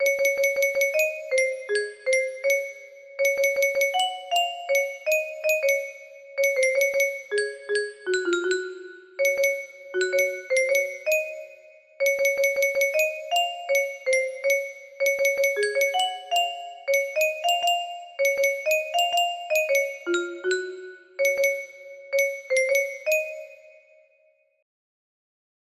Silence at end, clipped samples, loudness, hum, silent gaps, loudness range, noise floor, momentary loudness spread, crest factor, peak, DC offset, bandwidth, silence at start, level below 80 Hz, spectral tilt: 2.05 s; under 0.1%; -24 LUFS; none; none; 2 LU; -64 dBFS; 11 LU; 16 dB; -10 dBFS; under 0.1%; 15.5 kHz; 0 s; -74 dBFS; 0.5 dB/octave